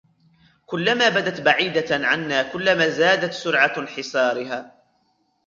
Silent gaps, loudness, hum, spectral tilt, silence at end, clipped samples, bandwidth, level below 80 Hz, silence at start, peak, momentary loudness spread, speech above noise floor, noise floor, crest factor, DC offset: none; -20 LUFS; none; -4 dB/octave; 0.8 s; under 0.1%; 7.6 kHz; -64 dBFS; 0.7 s; -2 dBFS; 10 LU; 46 dB; -66 dBFS; 20 dB; under 0.1%